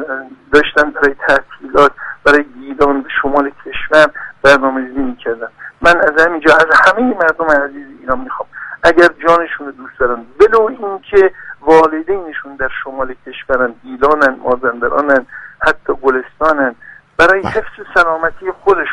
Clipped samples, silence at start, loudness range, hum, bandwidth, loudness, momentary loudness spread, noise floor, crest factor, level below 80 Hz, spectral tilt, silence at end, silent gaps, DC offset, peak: 0.2%; 0 s; 4 LU; none; 11.5 kHz; -12 LUFS; 14 LU; -34 dBFS; 12 dB; -40 dBFS; -4.5 dB/octave; 0 s; none; under 0.1%; 0 dBFS